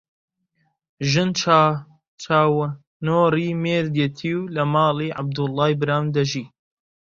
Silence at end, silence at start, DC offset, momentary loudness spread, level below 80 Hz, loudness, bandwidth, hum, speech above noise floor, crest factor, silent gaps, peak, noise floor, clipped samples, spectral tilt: 0.55 s; 1 s; under 0.1%; 10 LU; -58 dBFS; -21 LUFS; 7.6 kHz; none; 49 dB; 20 dB; 2.08-2.18 s, 2.87-3.00 s; -2 dBFS; -69 dBFS; under 0.1%; -6 dB/octave